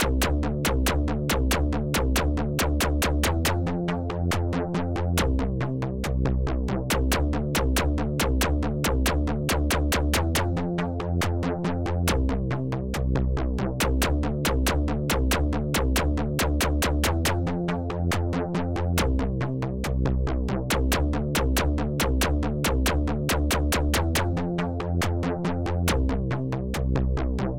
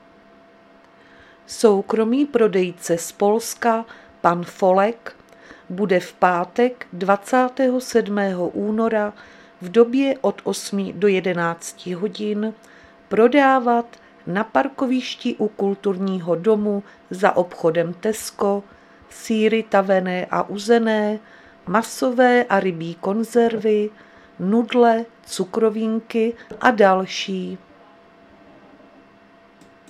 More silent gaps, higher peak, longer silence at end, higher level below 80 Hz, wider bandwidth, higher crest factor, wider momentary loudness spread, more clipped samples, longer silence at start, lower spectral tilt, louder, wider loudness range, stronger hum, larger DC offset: neither; second, -10 dBFS vs 0 dBFS; second, 0 s vs 2.35 s; first, -28 dBFS vs -64 dBFS; first, 17 kHz vs 14.5 kHz; about the same, 16 dB vs 20 dB; second, 4 LU vs 11 LU; neither; second, 0 s vs 1.5 s; about the same, -5 dB/octave vs -5.5 dB/octave; second, -26 LUFS vs -20 LUFS; about the same, 2 LU vs 2 LU; neither; first, 0.9% vs under 0.1%